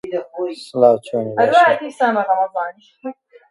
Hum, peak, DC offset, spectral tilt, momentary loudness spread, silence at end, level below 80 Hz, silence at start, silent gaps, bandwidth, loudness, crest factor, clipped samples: none; 0 dBFS; under 0.1%; -5.5 dB/octave; 20 LU; 0.4 s; -68 dBFS; 0.05 s; none; 11.5 kHz; -17 LUFS; 18 dB; under 0.1%